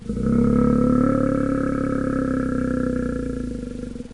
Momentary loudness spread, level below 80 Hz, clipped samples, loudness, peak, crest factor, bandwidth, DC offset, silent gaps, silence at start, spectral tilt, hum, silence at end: 11 LU; -34 dBFS; under 0.1%; -22 LUFS; -8 dBFS; 14 dB; 11 kHz; 0.4%; none; 0 s; -9 dB/octave; none; 0 s